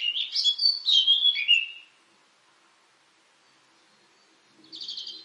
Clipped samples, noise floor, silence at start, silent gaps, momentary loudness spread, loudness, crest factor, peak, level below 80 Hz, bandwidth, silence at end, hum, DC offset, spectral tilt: under 0.1%; -63 dBFS; 0 s; none; 18 LU; -21 LUFS; 20 dB; -8 dBFS; under -90 dBFS; 11.5 kHz; 0 s; none; under 0.1%; 4 dB/octave